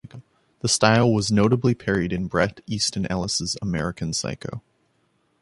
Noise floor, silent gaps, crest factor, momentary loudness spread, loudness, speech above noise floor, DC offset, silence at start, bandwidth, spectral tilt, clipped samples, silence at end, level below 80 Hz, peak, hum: -67 dBFS; none; 22 dB; 11 LU; -22 LUFS; 45 dB; under 0.1%; 0.05 s; 11.5 kHz; -4.5 dB/octave; under 0.1%; 0.85 s; -46 dBFS; -2 dBFS; none